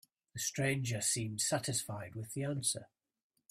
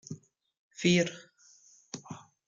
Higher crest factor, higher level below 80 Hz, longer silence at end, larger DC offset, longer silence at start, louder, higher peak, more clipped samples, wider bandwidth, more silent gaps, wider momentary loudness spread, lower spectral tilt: about the same, 18 dB vs 22 dB; about the same, -70 dBFS vs -70 dBFS; first, 0.65 s vs 0.3 s; neither; first, 0.35 s vs 0.1 s; second, -36 LUFS vs -28 LUFS; second, -20 dBFS vs -12 dBFS; neither; first, 16 kHz vs 7.6 kHz; second, none vs 0.59-0.71 s; second, 10 LU vs 23 LU; about the same, -3.5 dB/octave vs -4.5 dB/octave